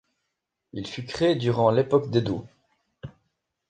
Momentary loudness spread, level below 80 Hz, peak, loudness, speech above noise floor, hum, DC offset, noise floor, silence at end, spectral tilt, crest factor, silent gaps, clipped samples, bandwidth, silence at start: 23 LU; -58 dBFS; -6 dBFS; -24 LUFS; 58 dB; none; under 0.1%; -81 dBFS; 0.6 s; -7 dB/octave; 20 dB; none; under 0.1%; 9.2 kHz; 0.75 s